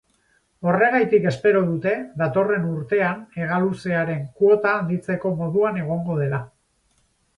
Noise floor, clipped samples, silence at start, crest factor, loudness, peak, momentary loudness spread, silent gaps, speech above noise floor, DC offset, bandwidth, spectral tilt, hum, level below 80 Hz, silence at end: -65 dBFS; under 0.1%; 0.6 s; 16 dB; -21 LUFS; -6 dBFS; 7 LU; none; 44 dB; under 0.1%; 10.5 kHz; -8.5 dB/octave; none; -60 dBFS; 0.9 s